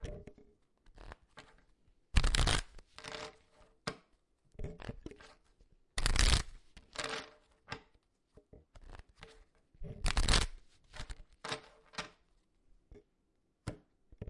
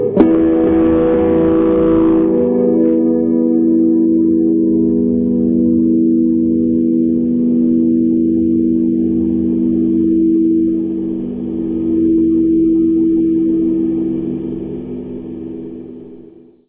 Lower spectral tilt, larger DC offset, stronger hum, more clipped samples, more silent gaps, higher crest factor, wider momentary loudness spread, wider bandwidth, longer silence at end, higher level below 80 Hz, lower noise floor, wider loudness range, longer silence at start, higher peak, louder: second, -3 dB/octave vs -13.5 dB/octave; second, under 0.1% vs 0.1%; neither; neither; neither; first, 28 dB vs 14 dB; first, 26 LU vs 9 LU; first, 11.5 kHz vs 3.5 kHz; second, 0.05 s vs 0.45 s; about the same, -40 dBFS vs -38 dBFS; first, -78 dBFS vs -40 dBFS; first, 11 LU vs 3 LU; about the same, 0 s vs 0 s; second, -10 dBFS vs 0 dBFS; second, -37 LUFS vs -14 LUFS